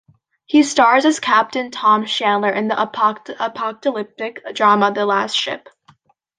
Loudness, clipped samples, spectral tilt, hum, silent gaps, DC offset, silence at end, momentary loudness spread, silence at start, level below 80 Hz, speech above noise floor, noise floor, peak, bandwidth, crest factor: -17 LUFS; under 0.1%; -3.5 dB/octave; none; none; under 0.1%; 0.8 s; 12 LU; 0.5 s; -70 dBFS; 37 dB; -54 dBFS; 0 dBFS; 10 kHz; 18 dB